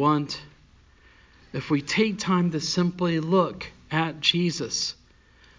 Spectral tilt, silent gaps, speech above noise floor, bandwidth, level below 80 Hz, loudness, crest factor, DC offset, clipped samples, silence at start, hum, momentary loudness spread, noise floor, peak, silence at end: -5 dB/octave; none; 31 dB; 7.6 kHz; -58 dBFS; -25 LUFS; 18 dB; under 0.1%; under 0.1%; 0 s; none; 13 LU; -56 dBFS; -8 dBFS; 0.65 s